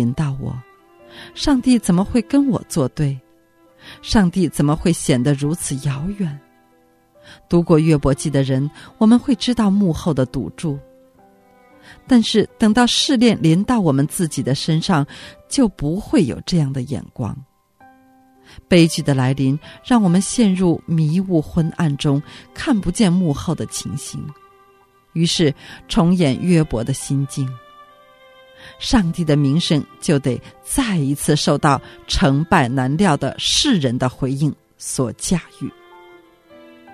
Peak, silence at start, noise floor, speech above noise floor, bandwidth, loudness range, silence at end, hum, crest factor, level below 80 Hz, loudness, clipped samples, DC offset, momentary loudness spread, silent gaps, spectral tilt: 0 dBFS; 0 s; -55 dBFS; 38 dB; 13.5 kHz; 4 LU; 0 s; none; 18 dB; -38 dBFS; -18 LUFS; under 0.1%; under 0.1%; 13 LU; none; -5.5 dB/octave